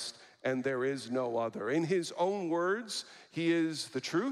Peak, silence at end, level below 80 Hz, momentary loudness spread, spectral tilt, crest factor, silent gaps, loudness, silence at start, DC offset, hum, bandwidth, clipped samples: -18 dBFS; 0 s; -84 dBFS; 8 LU; -4.5 dB/octave; 16 dB; none; -33 LUFS; 0 s; under 0.1%; none; 13 kHz; under 0.1%